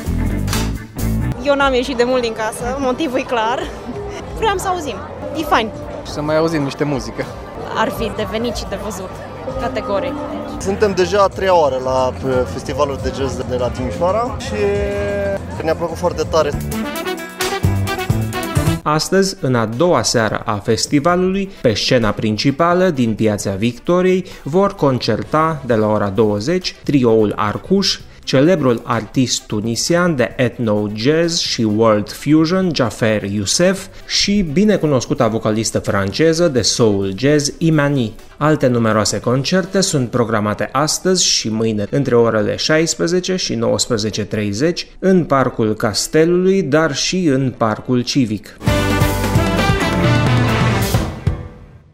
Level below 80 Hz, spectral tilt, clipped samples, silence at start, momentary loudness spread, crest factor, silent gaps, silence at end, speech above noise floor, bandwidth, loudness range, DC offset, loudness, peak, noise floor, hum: -34 dBFS; -5 dB/octave; under 0.1%; 0 s; 8 LU; 16 dB; none; 0.25 s; 20 dB; 16 kHz; 4 LU; under 0.1%; -16 LUFS; -2 dBFS; -36 dBFS; none